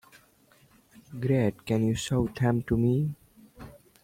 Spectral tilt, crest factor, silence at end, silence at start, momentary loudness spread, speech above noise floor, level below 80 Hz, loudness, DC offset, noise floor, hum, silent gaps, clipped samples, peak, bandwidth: -7 dB/octave; 16 dB; 0.3 s; 1.1 s; 23 LU; 35 dB; -52 dBFS; -27 LUFS; under 0.1%; -61 dBFS; none; none; under 0.1%; -12 dBFS; 16 kHz